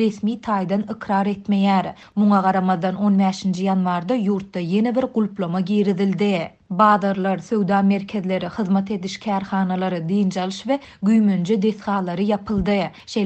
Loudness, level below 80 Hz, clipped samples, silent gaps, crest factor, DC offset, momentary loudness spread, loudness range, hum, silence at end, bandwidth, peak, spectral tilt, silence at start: -21 LUFS; -52 dBFS; under 0.1%; none; 18 dB; under 0.1%; 7 LU; 2 LU; none; 0 s; 8.4 kHz; -2 dBFS; -7.5 dB/octave; 0 s